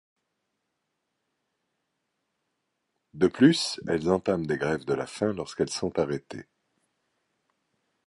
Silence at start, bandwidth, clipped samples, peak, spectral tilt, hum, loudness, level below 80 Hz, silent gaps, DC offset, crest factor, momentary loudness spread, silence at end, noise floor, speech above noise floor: 3.15 s; 11.5 kHz; under 0.1%; -6 dBFS; -5.5 dB/octave; none; -27 LUFS; -60 dBFS; none; under 0.1%; 24 dB; 10 LU; 1.65 s; -80 dBFS; 54 dB